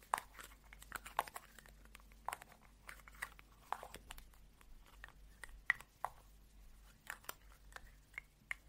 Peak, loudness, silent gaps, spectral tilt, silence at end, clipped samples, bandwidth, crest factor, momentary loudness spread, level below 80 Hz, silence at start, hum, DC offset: -18 dBFS; -48 LUFS; none; -1.5 dB/octave; 0 s; under 0.1%; 16 kHz; 32 dB; 21 LU; -64 dBFS; 0 s; none; under 0.1%